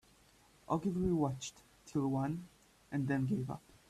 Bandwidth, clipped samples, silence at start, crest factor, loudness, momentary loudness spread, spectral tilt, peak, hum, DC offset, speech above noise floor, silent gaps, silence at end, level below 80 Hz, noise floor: 13.5 kHz; under 0.1%; 0.7 s; 16 dB; -37 LUFS; 11 LU; -7 dB/octave; -20 dBFS; none; under 0.1%; 30 dB; none; 0.3 s; -60 dBFS; -66 dBFS